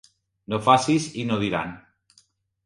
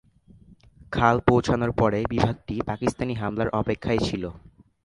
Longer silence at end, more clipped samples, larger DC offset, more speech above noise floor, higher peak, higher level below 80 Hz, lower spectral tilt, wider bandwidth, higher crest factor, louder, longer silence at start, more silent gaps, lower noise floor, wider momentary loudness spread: first, 0.85 s vs 0.45 s; neither; neither; first, 40 dB vs 29 dB; about the same, -2 dBFS vs -2 dBFS; second, -58 dBFS vs -42 dBFS; second, -5 dB/octave vs -7 dB/octave; about the same, 11.5 kHz vs 11.5 kHz; about the same, 22 dB vs 22 dB; about the same, -23 LUFS vs -24 LUFS; second, 0.5 s vs 0.9 s; neither; first, -62 dBFS vs -53 dBFS; about the same, 11 LU vs 9 LU